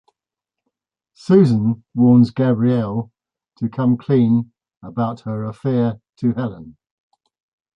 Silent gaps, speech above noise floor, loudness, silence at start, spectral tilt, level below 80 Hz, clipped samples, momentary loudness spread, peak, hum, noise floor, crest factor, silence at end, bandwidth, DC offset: 4.77-4.81 s; 69 dB; -18 LUFS; 1.3 s; -10 dB/octave; -56 dBFS; under 0.1%; 14 LU; -2 dBFS; none; -86 dBFS; 16 dB; 1.05 s; 6.2 kHz; under 0.1%